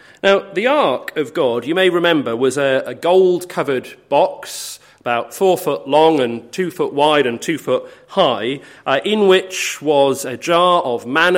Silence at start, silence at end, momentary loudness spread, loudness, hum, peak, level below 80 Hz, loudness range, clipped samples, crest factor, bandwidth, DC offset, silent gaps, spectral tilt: 0.25 s; 0 s; 9 LU; -16 LUFS; none; 0 dBFS; -66 dBFS; 2 LU; under 0.1%; 16 dB; 16.5 kHz; under 0.1%; none; -4 dB/octave